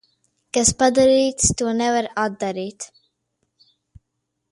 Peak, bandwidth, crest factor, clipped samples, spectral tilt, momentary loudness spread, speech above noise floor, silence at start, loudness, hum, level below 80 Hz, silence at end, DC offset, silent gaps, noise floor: 0 dBFS; 11.5 kHz; 20 dB; under 0.1%; -3 dB/octave; 15 LU; 58 dB; 0.55 s; -19 LUFS; none; -44 dBFS; 1.65 s; under 0.1%; none; -77 dBFS